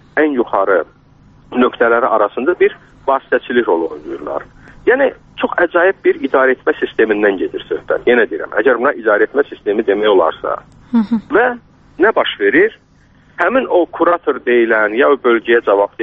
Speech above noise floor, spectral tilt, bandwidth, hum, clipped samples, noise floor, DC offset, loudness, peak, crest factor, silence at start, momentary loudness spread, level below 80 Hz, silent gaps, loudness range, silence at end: 34 dB; -2.5 dB/octave; 4.3 kHz; none; under 0.1%; -48 dBFS; under 0.1%; -14 LUFS; 0 dBFS; 14 dB; 0.15 s; 9 LU; -50 dBFS; none; 2 LU; 0 s